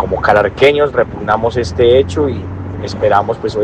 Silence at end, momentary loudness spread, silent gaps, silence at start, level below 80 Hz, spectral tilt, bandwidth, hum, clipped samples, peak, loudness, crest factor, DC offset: 0 s; 12 LU; none; 0 s; -36 dBFS; -6 dB/octave; 9.4 kHz; none; under 0.1%; 0 dBFS; -13 LUFS; 12 dB; under 0.1%